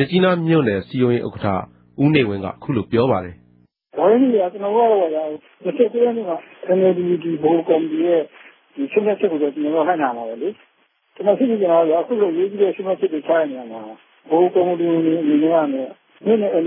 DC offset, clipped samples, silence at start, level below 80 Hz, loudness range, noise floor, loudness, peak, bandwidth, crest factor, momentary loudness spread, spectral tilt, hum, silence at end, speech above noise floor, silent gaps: under 0.1%; under 0.1%; 0 s; -62 dBFS; 2 LU; -62 dBFS; -19 LUFS; -2 dBFS; 4.8 kHz; 16 dB; 12 LU; -11.5 dB/octave; none; 0 s; 44 dB; none